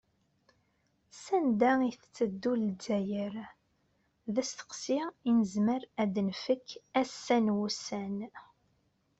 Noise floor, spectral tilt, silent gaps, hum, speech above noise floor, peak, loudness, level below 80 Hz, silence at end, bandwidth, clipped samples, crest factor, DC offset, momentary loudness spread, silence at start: -74 dBFS; -5.5 dB/octave; none; none; 43 dB; -14 dBFS; -32 LUFS; -74 dBFS; 0.75 s; 8.2 kHz; under 0.1%; 18 dB; under 0.1%; 12 LU; 1.15 s